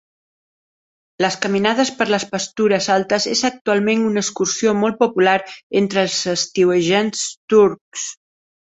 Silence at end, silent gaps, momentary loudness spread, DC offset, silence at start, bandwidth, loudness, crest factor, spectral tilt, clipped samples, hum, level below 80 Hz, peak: 0.6 s; 3.61-3.65 s, 5.63-5.70 s, 7.37-7.48 s, 7.81-7.92 s; 7 LU; under 0.1%; 1.2 s; 8.4 kHz; -18 LUFS; 16 dB; -3.5 dB/octave; under 0.1%; none; -60 dBFS; -2 dBFS